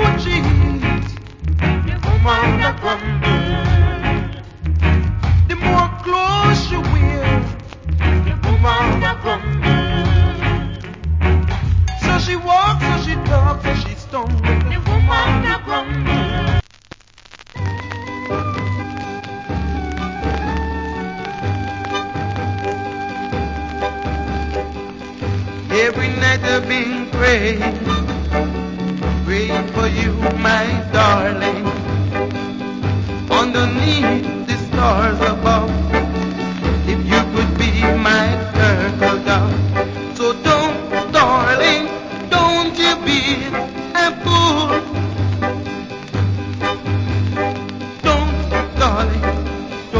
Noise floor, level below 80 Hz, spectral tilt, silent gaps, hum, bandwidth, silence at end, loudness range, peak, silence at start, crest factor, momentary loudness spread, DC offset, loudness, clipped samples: -43 dBFS; -24 dBFS; -6 dB/octave; none; none; 7.6 kHz; 0 s; 7 LU; 0 dBFS; 0 s; 16 dB; 10 LU; under 0.1%; -17 LUFS; under 0.1%